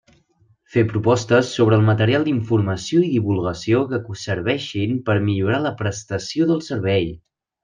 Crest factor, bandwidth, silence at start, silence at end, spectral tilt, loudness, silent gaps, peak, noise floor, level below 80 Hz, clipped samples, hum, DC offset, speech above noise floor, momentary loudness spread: 18 dB; 9.4 kHz; 0.75 s; 0.45 s; -6.5 dB/octave; -20 LUFS; none; -2 dBFS; -59 dBFS; -54 dBFS; under 0.1%; none; under 0.1%; 40 dB; 8 LU